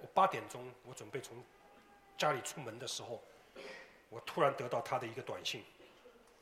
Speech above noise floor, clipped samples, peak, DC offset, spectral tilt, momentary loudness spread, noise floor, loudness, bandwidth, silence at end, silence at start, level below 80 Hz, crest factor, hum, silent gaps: 24 dB; under 0.1%; -16 dBFS; under 0.1%; -3.5 dB/octave; 21 LU; -63 dBFS; -39 LUFS; 16 kHz; 0.3 s; 0 s; -78 dBFS; 24 dB; none; none